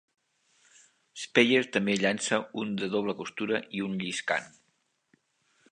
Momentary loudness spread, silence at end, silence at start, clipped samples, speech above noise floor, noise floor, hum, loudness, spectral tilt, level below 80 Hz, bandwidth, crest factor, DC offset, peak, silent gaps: 11 LU; 1.25 s; 1.15 s; under 0.1%; 46 dB; -74 dBFS; none; -28 LUFS; -4 dB/octave; -74 dBFS; 10 kHz; 24 dB; under 0.1%; -6 dBFS; none